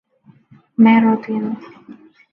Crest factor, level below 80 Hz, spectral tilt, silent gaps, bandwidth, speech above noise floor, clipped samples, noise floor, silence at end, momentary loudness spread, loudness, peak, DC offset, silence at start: 16 dB; -68 dBFS; -9.5 dB/octave; none; 4 kHz; 35 dB; under 0.1%; -50 dBFS; 0.4 s; 17 LU; -15 LUFS; -2 dBFS; under 0.1%; 0.8 s